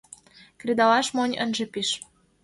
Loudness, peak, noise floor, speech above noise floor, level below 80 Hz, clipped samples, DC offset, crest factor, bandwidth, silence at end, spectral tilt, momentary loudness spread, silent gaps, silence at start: -24 LUFS; -8 dBFS; -52 dBFS; 28 dB; -68 dBFS; under 0.1%; under 0.1%; 18 dB; 11.5 kHz; 0.45 s; -2.5 dB/octave; 10 LU; none; 0.65 s